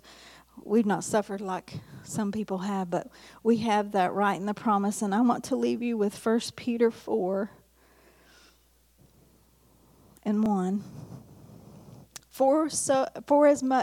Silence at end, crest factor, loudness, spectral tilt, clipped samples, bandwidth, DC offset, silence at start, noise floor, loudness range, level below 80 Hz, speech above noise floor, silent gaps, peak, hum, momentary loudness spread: 0 s; 18 dB; -27 LUFS; -5 dB/octave; under 0.1%; 16 kHz; under 0.1%; 0.05 s; -63 dBFS; 7 LU; -66 dBFS; 37 dB; none; -10 dBFS; none; 18 LU